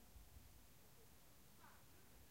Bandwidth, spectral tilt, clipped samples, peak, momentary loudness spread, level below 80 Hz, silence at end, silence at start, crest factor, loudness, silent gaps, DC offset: 16 kHz; -3.5 dB/octave; under 0.1%; -50 dBFS; 2 LU; -70 dBFS; 0 s; 0 s; 18 dB; -67 LUFS; none; under 0.1%